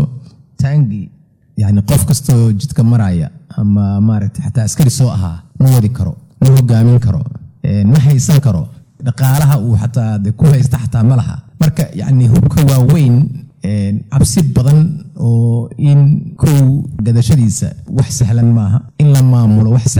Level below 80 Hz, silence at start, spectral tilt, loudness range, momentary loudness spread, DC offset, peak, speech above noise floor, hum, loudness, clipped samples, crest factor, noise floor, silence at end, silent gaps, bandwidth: -36 dBFS; 0 s; -7 dB/octave; 2 LU; 10 LU; under 0.1%; -2 dBFS; 22 dB; none; -12 LUFS; under 0.1%; 10 dB; -32 dBFS; 0 s; none; over 20 kHz